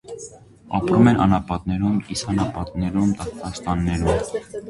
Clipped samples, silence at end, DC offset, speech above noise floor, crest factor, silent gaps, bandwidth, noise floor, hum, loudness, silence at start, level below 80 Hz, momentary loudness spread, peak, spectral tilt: under 0.1%; 0 s; under 0.1%; 21 dB; 18 dB; none; 11.5 kHz; -42 dBFS; none; -21 LUFS; 0.05 s; -36 dBFS; 14 LU; -2 dBFS; -6.5 dB/octave